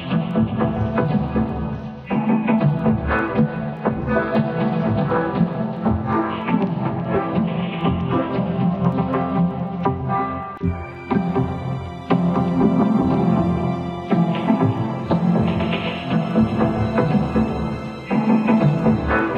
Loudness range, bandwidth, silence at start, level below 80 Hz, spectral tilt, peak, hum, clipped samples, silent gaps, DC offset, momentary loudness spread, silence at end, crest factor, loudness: 3 LU; 6.2 kHz; 0 s; -38 dBFS; -9.5 dB/octave; -4 dBFS; none; under 0.1%; none; under 0.1%; 7 LU; 0 s; 16 dB; -20 LUFS